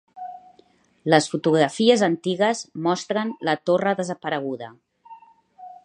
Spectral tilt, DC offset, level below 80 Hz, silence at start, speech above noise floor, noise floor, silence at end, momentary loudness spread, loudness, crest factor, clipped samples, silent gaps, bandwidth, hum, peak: -5 dB/octave; under 0.1%; -74 dBFS; 0.15 s; 37 dB; -58 dBFS; 0.1 s; 16 LU; -22 LUFS; 22 dB; under 0.1%; none; 10.5 kHz; none; -2 dBFS